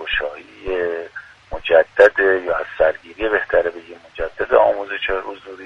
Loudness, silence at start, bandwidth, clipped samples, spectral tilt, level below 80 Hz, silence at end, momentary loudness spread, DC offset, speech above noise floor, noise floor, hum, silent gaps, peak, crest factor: -18 LUFS; 0 s; 7.4 kHz; under 0.1%; -5 dB/octave; -42 dBFS; 0 s; 20 LU; under 0.1%; 18 dB; -37 dBFS; none; none; 0 dBFS; 18 dB